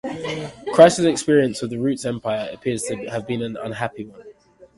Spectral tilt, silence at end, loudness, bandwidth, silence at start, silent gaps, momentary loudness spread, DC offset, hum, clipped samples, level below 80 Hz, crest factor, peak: -5 dB/octave; 0.15 s; -20 LUFS; 11.5 kHz; 0.05 s; none; 16 LU; under 0.1%; none; under 0.1%; -56 dBFS; 20 dB; 0 dBFS